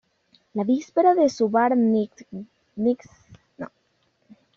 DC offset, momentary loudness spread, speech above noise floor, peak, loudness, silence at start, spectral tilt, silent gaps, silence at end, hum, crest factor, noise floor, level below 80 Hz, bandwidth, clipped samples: under 0.1%; 20 LU; 47 dB; -8 dBFS; -22 LUFS; 0.55 s; -6 dB/octave; none; 0.9 s; none; 16 dB; -68 dBFS; -68 dBFS; 7.2 kHz; under 0.1%